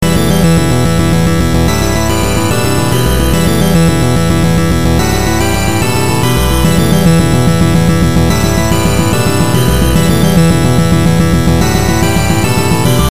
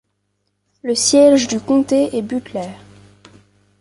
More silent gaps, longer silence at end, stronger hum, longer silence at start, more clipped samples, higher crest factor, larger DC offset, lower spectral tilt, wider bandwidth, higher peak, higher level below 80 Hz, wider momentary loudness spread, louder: neither; second, 0 s vs 1.05 s; second, none vs 50 Hz at -45 dBFS; second, 0 s vs 0.85 s; first, 0.3% vs under 0.1%; second, 10 dB vs 16 dB; first, 9% vs under 0.1%; first, -5.5 dB/octave vs -3.5 dB/octave; first, 16 kHz vs 11.5 kHz; about the same, 0 dBFS vs -2 dBFS; first, -20 dBFS vs -56 dBFS; second, 3 LU vs 17 LU; first, -10 LUFS vs -15 LUFS